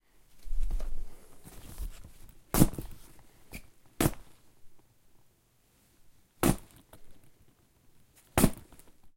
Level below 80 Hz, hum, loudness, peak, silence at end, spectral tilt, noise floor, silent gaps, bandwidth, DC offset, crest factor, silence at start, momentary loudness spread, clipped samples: -40 dBFS; none; -32 LUFS; -6 dBFS; 0.1 s; -5 dB/octave; -67 dBFS; none; 16.5 kHz; under 0.1%; 26 dB; 0.35 s; 26 LU; under 0.1%